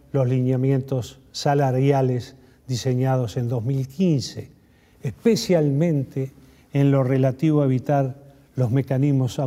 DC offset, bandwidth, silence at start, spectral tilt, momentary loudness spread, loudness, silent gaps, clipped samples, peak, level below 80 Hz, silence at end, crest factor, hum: under 0.1%; 14 kHz; 0.15 s; -7.5 dB/octave; 11 LU; -22 LUFS; none; under 0.1%; -6 dBFS; -56 dBFS; 0 s; 16 dB; none